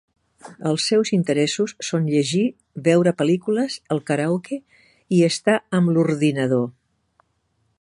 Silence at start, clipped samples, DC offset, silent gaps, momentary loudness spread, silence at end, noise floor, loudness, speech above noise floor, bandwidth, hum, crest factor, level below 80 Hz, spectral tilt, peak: 0.45 s; under 0.1%; under 0.1%; none; 8 LU; 1.1 s; -68 dBFS; -21 LUFS; 48 dB; 11.5 kHz; none; 18 dB; -66 dBFS; -5.5 dB/octave; -4 dBFS